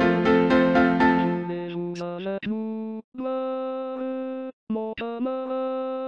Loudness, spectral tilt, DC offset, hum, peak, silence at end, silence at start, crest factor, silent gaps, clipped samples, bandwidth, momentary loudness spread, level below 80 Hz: -25 LUFS; -7.5 dB/octave; under 0.1%; none; -8 dBFS; 0 s; 0 s; 16 dB; 3.04-3.12 s, 4.53-4.67 s; under 0.1%; 6.8 kHz; 13 LU; -54 dBFS